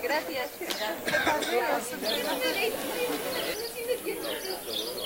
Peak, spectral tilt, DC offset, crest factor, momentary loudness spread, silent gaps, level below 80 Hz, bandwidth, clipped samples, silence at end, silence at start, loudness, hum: -10 dBFS; -2 dB/octave; under 0.1%; 20 dB; 6 LU; none; -62 dBFS; 16 kHz; under 0.1%; 0 s; 0 s; -30 LUFS; none